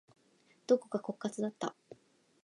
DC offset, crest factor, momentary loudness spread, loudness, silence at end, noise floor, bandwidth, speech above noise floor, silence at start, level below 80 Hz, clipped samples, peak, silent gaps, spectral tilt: under 0.1%; 22 dB; 10 LU; -36 LUFS; 0.5 s; -69 dBFS; 11 kHz; 34 dB; 0.7 s; -88 dBFS; under 0.1%; -16 dBFS; none; -5.5 dB/octave